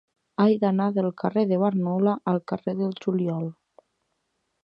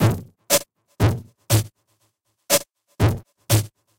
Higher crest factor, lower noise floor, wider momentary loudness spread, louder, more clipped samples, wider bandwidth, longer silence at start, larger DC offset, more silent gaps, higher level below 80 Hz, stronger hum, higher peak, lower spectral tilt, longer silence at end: about the same, 18 dB vs 18 dB; first, -76 dBFS vs -69 dBFS; second, 7 LU vs 11 LU; second, -25 LUFS vs -22 LUFS; neither; second, 5.4 kHz vs 17 kHz; first, 0.4 s vs 0 s; neither; neither; second, -72 dBFS vs -42 dBFS; neither; about the same, -8 dBFS vs -6 dBFS; first, -10 dB/octave vs -4.5 dB/octave; first, 1.1 s vs 0.3 s